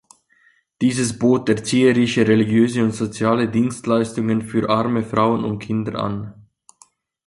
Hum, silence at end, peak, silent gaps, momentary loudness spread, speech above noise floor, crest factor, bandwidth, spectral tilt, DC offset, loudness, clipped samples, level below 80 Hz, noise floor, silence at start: none; 0.95 s; -2 dBFS; none; 8 LU; 40 dB; 16 dB; 11.5 kHz; -6 dB/octave; under 0.1%; -19 LUFS; under 0.1%; -54 dBFS; -58 dBFS; 0.8 s